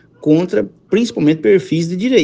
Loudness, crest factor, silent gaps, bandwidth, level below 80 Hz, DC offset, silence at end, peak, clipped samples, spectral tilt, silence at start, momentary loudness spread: -15 LUFS; 14 dB; none; 9.2 kHz; -56 dBFS; under 0.1%; 0 s; 0 dBFS; under 0.1%; -6.5 dB/octave; 0.2 s; 6 LU